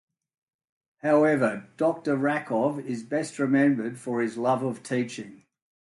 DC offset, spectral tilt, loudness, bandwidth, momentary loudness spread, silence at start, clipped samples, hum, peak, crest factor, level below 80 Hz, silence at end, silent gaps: under 0.1%; -6.5 dB/octave; -26 LUFS; 11.5 kHz; 10 LU; 1.05 s; under 0.1%; none; -10 dBFS; 18 dB; -74 dBFS; 0.5 s; none